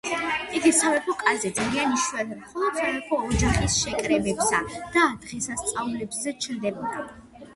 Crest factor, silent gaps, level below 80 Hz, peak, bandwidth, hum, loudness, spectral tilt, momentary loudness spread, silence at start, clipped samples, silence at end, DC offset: 20 dB; none; -40 dBFS; -6 dBFS; 12 kHz; none; -24 LUFS; -3.5 dB/octave; 9 LU; 0.05 s; under 0.1%; 0 s; under 0.1%